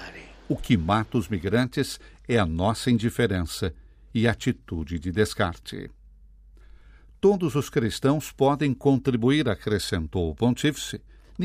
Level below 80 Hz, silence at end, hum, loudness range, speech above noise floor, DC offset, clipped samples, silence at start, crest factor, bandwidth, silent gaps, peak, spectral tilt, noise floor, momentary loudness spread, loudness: -46 dBFS; 0 s; none; 5 LU; 26 dB; under 0.1%; under 0.1%; 0 s; 18 dB; 15.5 kHz; none; -8 dBFS; -6 dB/octave; -51 dBFS; 11 LU; -25 LUFS